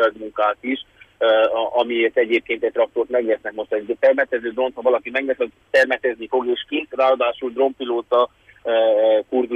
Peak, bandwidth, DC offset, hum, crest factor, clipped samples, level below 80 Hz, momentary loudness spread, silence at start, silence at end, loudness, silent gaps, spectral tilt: -6 dBFS; 7.8 kHz; under 0.1%; none; 14 dB; under 0.1%; -62 dBFS; 8 LU; 0 s; 0 s; -20 LUFS; none; -4 dB/octave